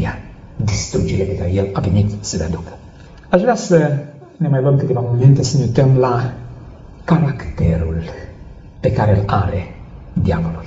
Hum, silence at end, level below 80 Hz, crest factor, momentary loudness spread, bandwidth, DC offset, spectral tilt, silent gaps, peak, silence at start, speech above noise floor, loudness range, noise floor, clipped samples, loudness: none; 0 s; -34 dBFS; 16 dB; 19 LU; 8 kHz; under 0.1%; -7.5 dB/octave; none; 0 dBFS; 0 s; 21 dB; 5 LU; -36 dBFS; under 0.1%; -17 LUFS